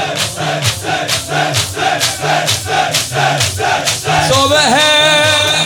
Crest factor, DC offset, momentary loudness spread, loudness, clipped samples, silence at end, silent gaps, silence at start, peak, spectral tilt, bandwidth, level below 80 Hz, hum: 12 dB; under 0.1%; 7 LU; -12 LUFS; under 0.1%; 0 s; none; 0 s; 0 dBFS; -2.5 dB/octave; 18 kHz; -44 dBFS; none